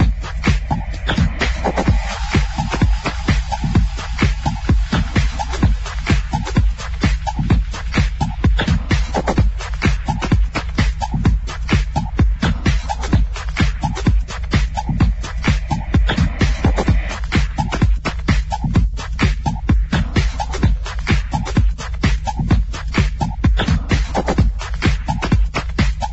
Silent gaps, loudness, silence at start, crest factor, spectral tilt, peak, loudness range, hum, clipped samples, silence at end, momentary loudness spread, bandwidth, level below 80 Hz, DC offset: none; -19 LUFS; 0 s; 16 dB; -6 dB/octave; -2 dBFS; 1 LU; none; under 0.1%; 0 s; 4 LU; 8.2 kHz; -20 dBFS; under 0.1%